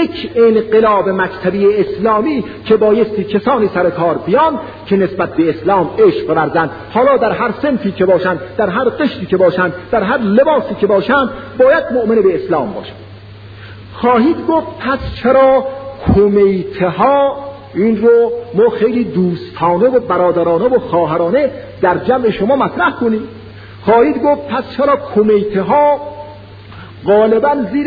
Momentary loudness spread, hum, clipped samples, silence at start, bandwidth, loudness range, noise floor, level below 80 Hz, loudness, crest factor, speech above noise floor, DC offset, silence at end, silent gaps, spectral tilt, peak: 8 LU; none; under 0.1%; 0 s; 5 kHz; 2 LU; -33 dBFS; -40 dBFS; -13 LUFS; 12 dB; 21 dB; under 0.1%; 0 s; none; -9.5 dB/octave; 0 dBFS